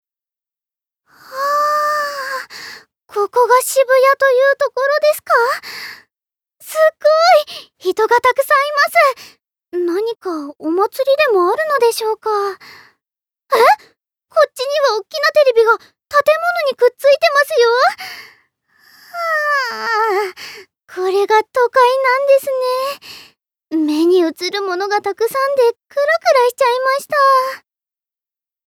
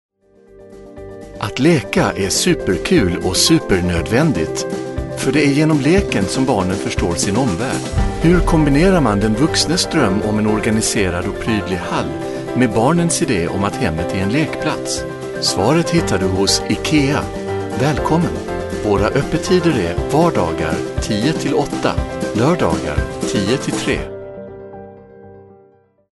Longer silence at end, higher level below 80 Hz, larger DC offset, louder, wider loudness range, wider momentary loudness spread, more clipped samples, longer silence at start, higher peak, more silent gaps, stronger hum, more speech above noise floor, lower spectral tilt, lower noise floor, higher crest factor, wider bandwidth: first, 1.1 s vs 0.7 s; second, -70 dBFS vs -32 dBFS; neither; about the same, -15 LUFS vs -16 LUFS; about the same, 3 LU vs 3 LU; first, 13 LU vs 9 LU; neither; first, 1.3 s vs 0.55 s; about the same, -2 dBFS vs 0 dBFS; neither; neither; first, 74 dB vs 36 dB; second, -1.5 dB/octave vs -5 dB/octave; first, -88 dBFS vs -52 dBFS; about the same, 14 dB vs 16 dB; first, 18.5 kHz vs 12 kHz